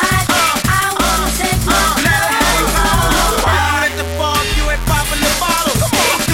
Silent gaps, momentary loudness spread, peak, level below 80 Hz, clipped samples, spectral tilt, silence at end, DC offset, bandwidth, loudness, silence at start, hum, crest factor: none; 3 LU; 0 dBFS; -22 dBFS; under 0.1%; -3 dB/octave; 0 s; under 0.1%; 17 kHz; -13 LUFS; 0 s; none; 14 dB